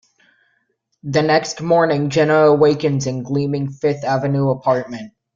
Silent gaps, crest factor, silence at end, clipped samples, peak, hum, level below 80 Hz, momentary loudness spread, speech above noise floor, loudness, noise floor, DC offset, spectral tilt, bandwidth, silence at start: none; 16 dB; 0.3 s; under 0.1%; -2 dBFS; none; -56 dBFS; 9 LU; 51 dB; -17 LUFS; -67 dBFS; under 0.1%; -6 dB/octave; 7.6 kHz; 1.05 s